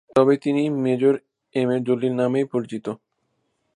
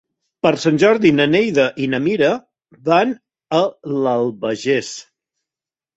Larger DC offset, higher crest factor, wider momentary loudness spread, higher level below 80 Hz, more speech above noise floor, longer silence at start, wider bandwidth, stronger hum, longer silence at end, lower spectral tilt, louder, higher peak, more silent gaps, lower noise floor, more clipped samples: neither; about the same, 18 dB vs 16 dB; about the same, 12 LU vs 10 LU; second, -66 dBFS vs -58 dBFS; second, 52 dB vs 74 dB; second, 0.15 s vs 0.45 s; first, 10.5 kHz vs 8.2 kHz; neither; second, 0.8 s vs 0.95 s; first, -7.5 dB/octave vs -5.5 dB/octave; second, -22 LUFS vs -17 LUFS; about the same, -4 dBFS vs -2 dBFS; neither; second, -72 dBFS vs -90 dBFS; neither